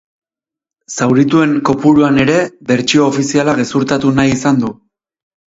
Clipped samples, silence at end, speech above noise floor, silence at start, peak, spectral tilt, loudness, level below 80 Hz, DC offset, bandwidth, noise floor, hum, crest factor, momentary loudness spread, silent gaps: under 0.1%; 0.85 s; 75 dB; 0.9 s; 0 dBFS; -5.5 dB/octave; -12 LUFS; -44 dBFS; under 0.1%; 8 kHz; -86 dBFS; none; 14 dB; 6 LU; none